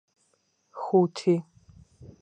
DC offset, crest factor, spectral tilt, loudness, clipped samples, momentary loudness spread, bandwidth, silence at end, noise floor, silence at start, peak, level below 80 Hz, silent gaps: under 0.1%; 18 dB; -7.5 dB/octave; -26 LUFS; under 0.1%; 16 LU; 9.4 kHz; 0.15 s; -71 dBFS; 0.75 s; -10 dBFS; -64 dBFS; none